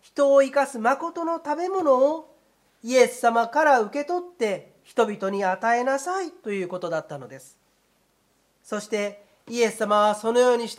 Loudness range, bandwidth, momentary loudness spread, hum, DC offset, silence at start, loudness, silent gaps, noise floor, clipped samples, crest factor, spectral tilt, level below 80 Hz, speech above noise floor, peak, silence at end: 9 LU; 14.5 kHz; 13 LU; none; under 0.1%; 0.15 s; -23 LUFS; none; -66 dBFS; under 0.1%; 18 dB; -4 dB/octave; -78 dBFS; 43 dB; -4 dBFS; 0.05 s